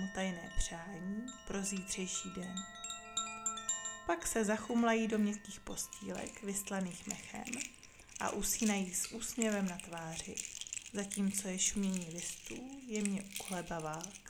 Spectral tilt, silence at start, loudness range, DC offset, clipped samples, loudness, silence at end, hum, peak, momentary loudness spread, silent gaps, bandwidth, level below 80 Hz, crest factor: -3.5 dB/octave; 0 s; 4 LU; under 0.1%; under 0.1%; -38 LUFS; 0 s; none; -18 dBFS; 10 LU; none; 18.5 kHz; -54 dBFS; 22 dB